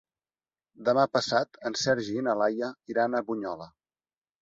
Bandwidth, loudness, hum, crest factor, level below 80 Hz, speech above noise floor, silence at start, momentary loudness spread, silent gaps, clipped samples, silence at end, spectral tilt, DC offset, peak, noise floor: 8 kHz; -28 LUFS; none; 20 dB; -70 dBFS; over 62 dB; 0.8 s; 9 LU; none; under 0.1%; 0.75 s; -4 dB/octave; under 0.1%; -10 dBFS; under -90 dBFS